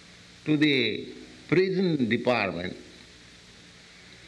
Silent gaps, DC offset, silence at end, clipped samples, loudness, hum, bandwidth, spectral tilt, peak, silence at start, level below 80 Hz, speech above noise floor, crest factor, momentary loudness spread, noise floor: none; under 0.1%; 0 s; under 0.1%; -26 LUFS; none; 10.5 kHz; -6.5 dB/octave; -12 dBFS; 0.45 s; -64 dBFS; 26 dB; 16 dB; 20 LU; -51 dBFS